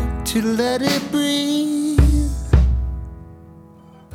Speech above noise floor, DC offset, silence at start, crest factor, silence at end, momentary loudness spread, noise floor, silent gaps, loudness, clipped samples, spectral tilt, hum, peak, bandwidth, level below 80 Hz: 25 dB; under 0.1%; 0 s; 18 dB; 0 s; 12 LU; -44 dBFS; none; -19 LUFS; under 0.1%; -5.5 dB/octave; none; 0 dBFS; 16 kHz; -22 dBFS